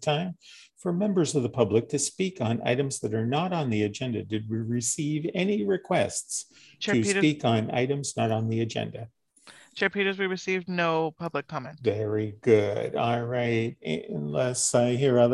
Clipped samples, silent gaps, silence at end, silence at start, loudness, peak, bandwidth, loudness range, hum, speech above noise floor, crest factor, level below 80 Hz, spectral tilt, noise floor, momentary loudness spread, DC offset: under 0.1%; none; 0 s; 0 s; -27 LUFS; -8 dBFS; 12.5 kHz; 2 LU; none; 28 dB; 20 dB; -62 dBFS; -5 dB/octave; -54 dBFS; 10 LU; under 0.1%